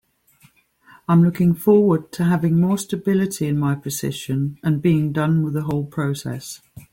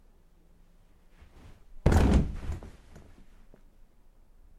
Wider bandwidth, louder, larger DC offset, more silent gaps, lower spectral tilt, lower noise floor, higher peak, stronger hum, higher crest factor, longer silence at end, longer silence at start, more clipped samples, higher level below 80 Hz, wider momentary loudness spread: first, 17 kHz vs 13.5 kHz; first, -20 LUFS vs -28 LUFS; neither; neither; about the same, -7 dB/octave vs -7.5 dB/octave; about the same, -56 dBFS vs -58 dBFS; first, -4 dBFS vs -8 dBFS; neither; second, 16 dB vs 24 dB; second, 0.1 s vs 1.9 s; second, 1.1 s vs 1.5 s; neither; second, -54 dBFS vs -36 dBFS; second, 10 LU vs 19 LU